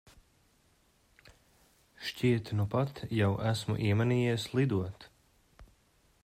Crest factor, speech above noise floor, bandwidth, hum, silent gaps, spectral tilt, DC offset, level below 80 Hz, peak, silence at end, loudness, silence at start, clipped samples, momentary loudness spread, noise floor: 18 dB; 38 dB; 15 kHz; none; none; -7 dB/octave; under 0.1%; -62 dBFS; -16 dBFS; 0.6 s; -31 LUFS; 2 s; under 0.1%; 11 LU; -68 dBFS